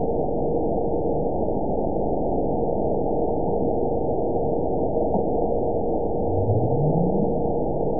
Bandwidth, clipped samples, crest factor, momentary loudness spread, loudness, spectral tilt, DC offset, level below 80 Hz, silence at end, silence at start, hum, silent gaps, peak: 1 kHz; under 0.1%; 14 dB; 3 LU; -24 LUFS; -18.5 dB/octave; 4%; -36 dBFS; 0 s; 0 s; none; none; -8 dBFS